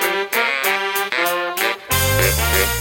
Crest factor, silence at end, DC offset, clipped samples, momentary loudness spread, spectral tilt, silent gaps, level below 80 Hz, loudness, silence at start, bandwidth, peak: 18 dB; 0 s; under 0.1%; under 0.1%; 4 LU; -2.5 dB/octave; none; -30 dBFS; -17 LUFS; 0 s; 17 kHz; -2 dBFS